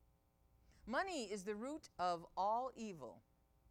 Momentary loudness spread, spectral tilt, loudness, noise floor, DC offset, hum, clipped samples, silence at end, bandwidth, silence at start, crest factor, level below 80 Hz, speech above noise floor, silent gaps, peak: 13 LU; -4 dB/octave; -44 LUFS; -75 dBFS; under 0.1%; none; under 0.1%; 0.5 s; 16.5 kHz; 0.85 s; 18 dB; -72 dBFS; 32 dB; none; -28 dBFS